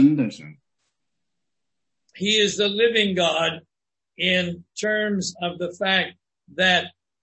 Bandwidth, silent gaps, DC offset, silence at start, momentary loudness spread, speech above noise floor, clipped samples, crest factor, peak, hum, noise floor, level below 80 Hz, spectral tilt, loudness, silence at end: 8.6 kHz; none; under 0.1%; 0 s; 11 LU; 61 dB; under 0.1%; 20 dB; -4 dBFS; none; -84 dBFS; -66 dBFS; -4 dB/octave; -22 LUFS; 0.35 s